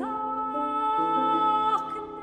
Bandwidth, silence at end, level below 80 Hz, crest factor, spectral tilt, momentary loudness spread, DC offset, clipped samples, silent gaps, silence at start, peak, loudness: 9.4 kHz; 0 s; -62 dBFS; 12 dB; -5.5 dB/octave; 7 LU; under 0.1%; under 0.1%; none; 0 s; -14 dBFS; -26 LUFS